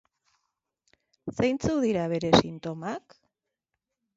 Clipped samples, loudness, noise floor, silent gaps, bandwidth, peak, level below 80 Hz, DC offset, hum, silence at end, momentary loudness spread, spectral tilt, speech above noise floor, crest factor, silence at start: under 0.1%; -26 LUFS; -85 dBFS; none; 8 kHz; -4 dBFS; -54 dBFS; under 0.1%; none; 1.2 s; 16 LU; -5.5 dB/octave; 59 dB; 26 dB; 1.25 s